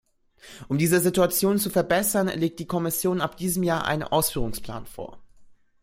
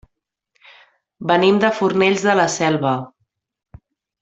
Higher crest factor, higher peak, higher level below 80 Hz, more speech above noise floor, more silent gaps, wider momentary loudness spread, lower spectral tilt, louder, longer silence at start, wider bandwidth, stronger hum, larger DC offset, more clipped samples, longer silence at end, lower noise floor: about the same, 18 dB vs 18 dB; second, -6 dBFS vs -2 dBFS; first, -48 dBFS vs -58 dBFS; second, 27 dB vs 58 dB; neither; first, 16 LU vs 10 LU; about the same, -4.5 dB/octave vs -4.5 dB/octave; second, -24 LUFS vs -17 LUFS; second, 0.45 s vs 1.2 s; first, 16.5 kHz vs 8.2 kHz; neither; neither; neither; second, 0.3 s vs 1.15 s; second, -51 dBFS vs -74 dBFS